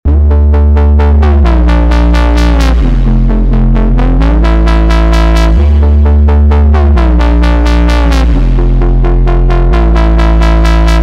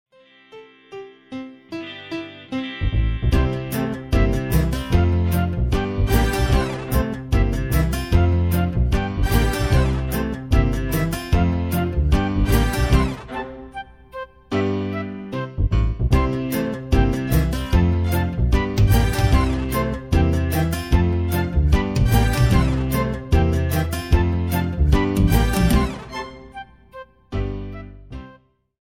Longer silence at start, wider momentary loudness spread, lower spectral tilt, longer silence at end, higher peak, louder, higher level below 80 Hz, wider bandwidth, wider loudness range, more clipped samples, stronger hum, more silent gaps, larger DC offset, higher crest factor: second, 0.05 s vs 0.55 s; second, 3 LU vs 17 LU; about the same, -7.5 dB/octave vs -6.5 dB/octave; second, 0 s vs 0.5 s; first, 0 dBFS vs -4 dBFS; first, -8 LUFS vs -21 LUFS; first, -6 dBFS vs -24 dBFS; second, 7.6 kHz vs 17 kHz; second, 1 LU vs 5 LU; neither; neither; neither; second, under 0.1% vs 0.2%; second, 6 dB vs 16 dB